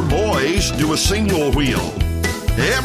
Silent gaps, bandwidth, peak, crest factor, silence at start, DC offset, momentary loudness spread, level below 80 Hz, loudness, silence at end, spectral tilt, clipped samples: none; 16 kHz; -4 dBFS; 14 dB; 0 s; under 0.1%; 4 LU; -24 dBFS; -18 LUFS; 0 s; -4.5 dB/octave; under 0.1%